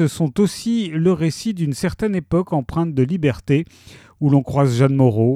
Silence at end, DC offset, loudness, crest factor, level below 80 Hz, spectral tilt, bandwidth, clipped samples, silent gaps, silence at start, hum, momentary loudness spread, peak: 0 s; under 0.1%; -19 LUFS; 16 dB; -44 dBFS; -7.5 dB/octave; 14 kHz; under 0.1%; none; 0 s; none; 6 LU; -2 dBFS